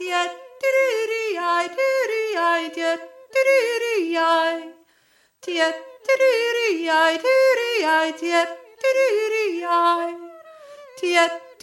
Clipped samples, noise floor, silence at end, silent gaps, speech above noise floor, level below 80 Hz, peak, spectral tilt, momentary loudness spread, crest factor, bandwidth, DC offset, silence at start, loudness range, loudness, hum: under 0.1%; -61 dBFS; 0.1 s; none; 41 dB; -84 dBFS; -6 dBFS; -0.5 dB/octave; 8 LU; 16 dB; 14 kHz; under 0.1%; 0 s; 3 LU; -21 LUFS; none